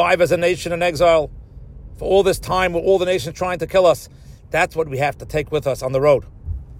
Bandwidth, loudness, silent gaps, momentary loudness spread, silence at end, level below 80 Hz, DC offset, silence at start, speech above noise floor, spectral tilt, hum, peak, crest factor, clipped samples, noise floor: 16.5 kHz; -18 LUFS; none; 8 LU; 0 s; -38 dBFS; under 0.1%; 0 s; 20 dB; -5 dB/octave; none; -2 dBFS; 16 dB; under 0.1%; -37 dBFS